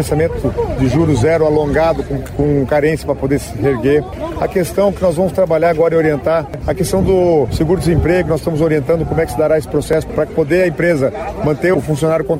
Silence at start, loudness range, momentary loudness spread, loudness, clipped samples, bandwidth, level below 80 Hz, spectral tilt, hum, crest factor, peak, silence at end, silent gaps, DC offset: 0 s; 1 LU; 6 LU; -15 LUFS; under 0.1%; 16 kHz; -30 dBFS; -7 dB/octave; none; 10 dB; -4 dBFS; 0 s; none; under 0.1%